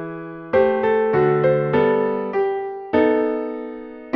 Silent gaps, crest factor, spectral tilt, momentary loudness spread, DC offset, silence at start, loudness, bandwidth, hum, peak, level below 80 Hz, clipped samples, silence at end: none; 14 dB; -9.5 dB/octave; 14 LU; under 0.1%; 0 s; -19 LUFS; 5.2 kHz; none; -4 dBFS; -54 dBFS; under 0.1%; 0 s